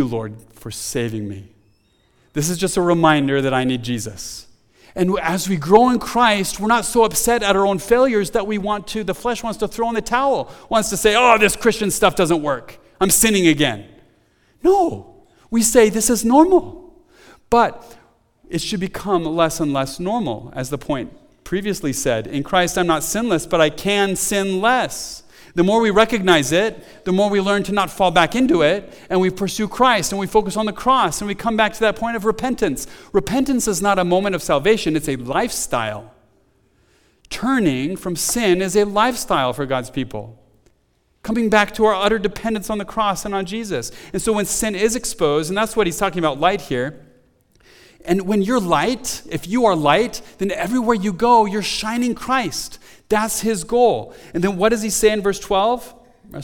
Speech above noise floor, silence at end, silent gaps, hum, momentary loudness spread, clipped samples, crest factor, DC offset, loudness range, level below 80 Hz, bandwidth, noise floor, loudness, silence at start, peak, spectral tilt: 44 dB; 0 s; none; none; 11 LU; under 0.1%; 18 dB; under 0.1%; 5 LU; -42 dBFS; 19 kHz; -62 dBFS; -18 LUFS; 0 s; 0 dBFS; -4 dB/octave